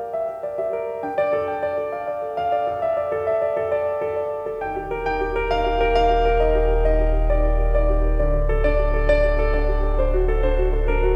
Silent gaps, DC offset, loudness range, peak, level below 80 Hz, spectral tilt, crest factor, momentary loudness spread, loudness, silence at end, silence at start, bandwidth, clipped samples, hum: none; under 0.1%; 3 LU; -6 dBFS; -22 dBFS; -8 dB/octave; 14 dB; 8 LU; -22 LUFS; 0 s; 0 s; 5.4 kHz; under 0.1%; none